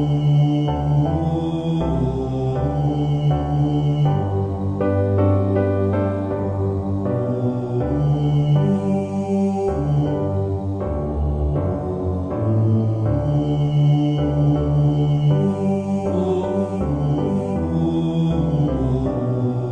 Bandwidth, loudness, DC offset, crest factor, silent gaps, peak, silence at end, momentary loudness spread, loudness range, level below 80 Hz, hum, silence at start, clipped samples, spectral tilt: 7 kHz; -20 LUFS; under 0.1%; 12 dB; none; -6 dBFS; 0 s; 5 LU; 3 LU; -34 dBFS; none; 0 s; under 0.1%; -9.5 dB/octave